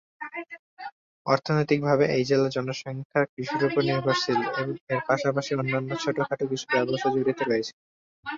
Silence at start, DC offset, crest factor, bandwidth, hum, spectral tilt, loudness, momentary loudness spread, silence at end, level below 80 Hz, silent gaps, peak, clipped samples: 0.2 s; under 0.1%; 20 dB; 7.6 kHz; none; -6 dB/octave; -26 LUFS; 14 LU; 0 s; -66 dBFS; 0.59-0.77 s, 0.92-1.25 s, 3.05-3.10 s, 3.29-3.37 s, 4.81-4.87 s, 7.73-8.23 s; -6 dBFS; under 0.1%